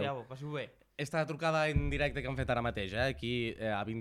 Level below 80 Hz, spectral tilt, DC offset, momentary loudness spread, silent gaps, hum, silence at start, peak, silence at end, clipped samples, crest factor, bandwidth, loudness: -46 dBFS; -6 dB/octave; under 0.1%; 10 LU; none; none; 0 s; -18 dBFS; 0 s; under 0.1%; 16 dB; 14 kHz; -35 LUFS